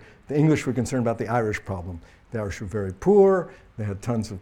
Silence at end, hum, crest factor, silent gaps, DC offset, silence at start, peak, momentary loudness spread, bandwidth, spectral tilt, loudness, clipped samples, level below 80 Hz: 0 s; none; 16 dB; none; under 0.1%; 0 s; -6 dBFS; 16 LU; 12.5 kHz; -7.5 dB/octave; -24 LUFS; under 0.1%; -48 dBFS